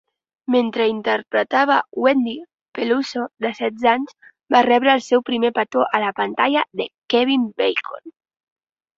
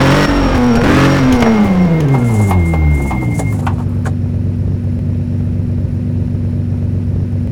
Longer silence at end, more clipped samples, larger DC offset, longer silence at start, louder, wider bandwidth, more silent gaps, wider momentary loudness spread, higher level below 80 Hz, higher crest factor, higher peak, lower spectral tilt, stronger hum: first, 0.9 s vs 0 s; neither; neither; first, 0.5 s vs 0 s; second, -19 LUFS vs -13 LUFS; second, 7.6 kHz vs 14.5 kHz; first, 2.68-2.72 s, 6.98-7.02 s vs none; first, 10 LU vs 7 LU; second, -66 dBFS vs -22 dBFS; first, 20 dB vs 12 dB; about the same, 0 dBFS vs 0 dBFS; second, -4.5 dB/octave vs -7.5 dB/octave; neither